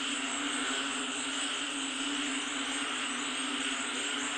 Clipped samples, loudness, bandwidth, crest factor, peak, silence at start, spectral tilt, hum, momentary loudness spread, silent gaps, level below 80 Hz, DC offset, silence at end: under 0.1%; -32 LUFS; 10.5 kHz; 14 dB; -20 dBFS; 0 s; 0.5 dB/octave; none; 1 LU; none; -72 dBFS; under 0.1%; 0 s